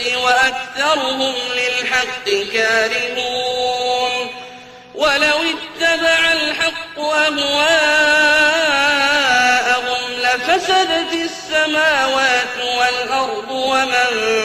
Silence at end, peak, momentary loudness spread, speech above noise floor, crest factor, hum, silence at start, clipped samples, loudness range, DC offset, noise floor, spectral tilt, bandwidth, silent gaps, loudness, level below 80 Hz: 0 s; -2 dBFS; 7 LU; 20 dB; 14 dB; none; 0 s; under 0.1%; 4 LU; under 0.1%; -37 dBFS; -1 dB/octave; 15.5 kHz; none; -15 LUFS; -52 dBFS